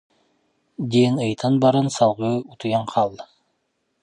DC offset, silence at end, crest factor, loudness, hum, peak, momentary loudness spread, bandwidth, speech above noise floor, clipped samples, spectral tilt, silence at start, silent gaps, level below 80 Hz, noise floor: under 0.1%; 0.8 s; 18 dB; -21 LUFS; none; -4 dBFS; 10 LU; 11.5 kHz; 52 dB; under 0.1%; -6.5 dB/octave; 0.8 s; none; -62 dBFS; -72 dBFS